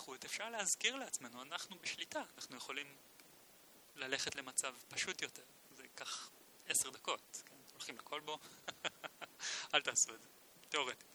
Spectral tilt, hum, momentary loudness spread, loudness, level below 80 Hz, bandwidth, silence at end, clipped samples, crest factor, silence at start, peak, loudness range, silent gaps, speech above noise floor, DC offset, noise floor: 0.5 dB/octave; none; 23 LU; -41 LUFS; -86 dBFS; over 20 kHz; 0 s; under 0.1%; 28 dB; 0 s; -16 dBFS; 4 LU; none; 20 dB; under 0.1%; -64 dBFS